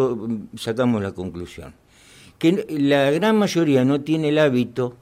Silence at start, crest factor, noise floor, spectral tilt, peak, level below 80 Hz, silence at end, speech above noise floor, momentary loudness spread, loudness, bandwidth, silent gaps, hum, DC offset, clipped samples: 0 s; 14 dB; -49 dBFS; -6.5 dB/octave; -6 dBFS; -58 dBFS; 0.1 s; 29 dB; 13 LU; -20 LUFS; 15.5 kHz; none; none; under 0.1%; under 0.1%